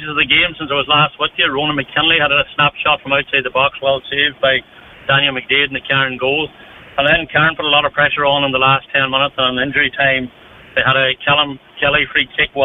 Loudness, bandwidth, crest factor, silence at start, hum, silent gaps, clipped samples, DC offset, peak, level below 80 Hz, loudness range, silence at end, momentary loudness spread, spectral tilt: -14 LUFS; 4.1 kHz; 14 dB; 0 s; none; none; under 0.1%; under 0.1%; -2 dBFS; -44 dBFS; 2 LU; 0 s; 6 LU; -7 dB/octave